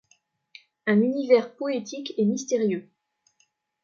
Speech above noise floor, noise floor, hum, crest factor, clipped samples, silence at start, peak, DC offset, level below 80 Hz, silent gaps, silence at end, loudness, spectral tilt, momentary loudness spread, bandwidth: 46 dB; -70 dBFS; none; 20 dB; under 0.1%; 0.85 s; -6 dBFS; under 0.1%; -76 dBFS; none; 1 s; -25 LUFS; -5.5 dB/octave; 10 LU; 7.4 kHz